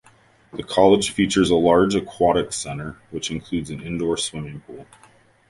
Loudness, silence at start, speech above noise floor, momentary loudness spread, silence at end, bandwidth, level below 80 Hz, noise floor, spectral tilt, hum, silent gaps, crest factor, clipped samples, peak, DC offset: -20 LUFS; 0.55 s; 34 dB; 18 LU; 0.65 s; 11.5 kHz; -46 dBFS; -55 dBFS; -4.5 dB/octave; none; none; 20 dB; under 0.1%; -2 dBFS; under 0.1%